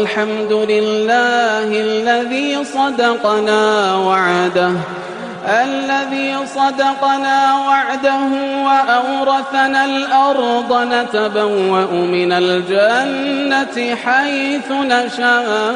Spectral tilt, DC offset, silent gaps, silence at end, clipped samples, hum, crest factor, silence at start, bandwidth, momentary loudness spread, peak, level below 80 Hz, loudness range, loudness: -4 dB/octave; under 0.1%; none; 0 s; under 0.1%; none; 12 dB; 0 s; 10.5 kHz; 5 LU; -2 dBFS; -62 dBFS; 1 LU; -15 LUFS